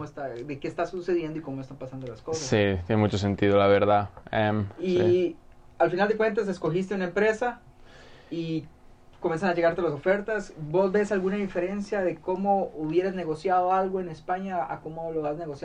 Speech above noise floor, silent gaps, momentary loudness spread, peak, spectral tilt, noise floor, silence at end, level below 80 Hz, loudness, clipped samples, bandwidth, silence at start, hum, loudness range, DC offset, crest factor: 23 dB; none; 12 LU; -10 dBFS; -6.5 dB/octave; -49 dBFS; 0 s; -54 dBFS; -27 LUFS; under 0.1%; 9.6 kHz; 0 s; none; 5 LU; under 0.1%; 16 dB